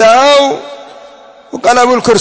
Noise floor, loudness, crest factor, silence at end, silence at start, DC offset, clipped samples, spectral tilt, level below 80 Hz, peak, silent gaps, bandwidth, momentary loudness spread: -36 dBFS; -8 LUFS; 10 dB; 0 s; 0 s; under 0.1%; 0.3%; -3 dB/octave; -50 dBFS; 0 dBFS; none; 8 kHz; 22 LU